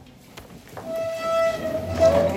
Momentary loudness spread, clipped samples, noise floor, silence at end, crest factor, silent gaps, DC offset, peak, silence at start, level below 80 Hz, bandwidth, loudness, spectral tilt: 24 LU; under 0.1%; -45 dBFS; 0 s; 16 dB; none; under 0.1%; -6 dBFS; 0 s; -46 dBFS; 16 kHz; -23 LUFS; -5.5 dB/octave